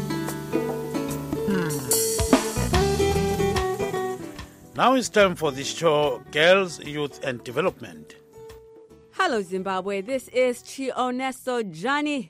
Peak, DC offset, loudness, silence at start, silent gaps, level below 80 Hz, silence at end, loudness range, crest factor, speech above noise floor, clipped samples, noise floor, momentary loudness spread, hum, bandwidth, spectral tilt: -2 dBFS; under 0.1%; -24 LUFS; 0 s; none; -42 dBFS; 0 s; 6 LU; 22 dB; 25 dB; under 0.1%; -49 dBFS; 10 LU; none; 16 kHz; -4 dB/octave